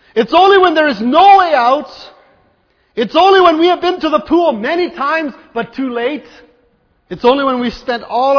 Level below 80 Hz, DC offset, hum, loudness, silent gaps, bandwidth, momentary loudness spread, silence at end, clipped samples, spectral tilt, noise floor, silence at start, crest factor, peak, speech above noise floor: -48 dBFS; under 0.1%; none; -12 LUFS; none; 5.4 kHz; 14 LU; 0 s; 0.1%; -5 dB/octave; -56 dBFS; 0.15 s; 12 dB; 0 dBFS; 45 dB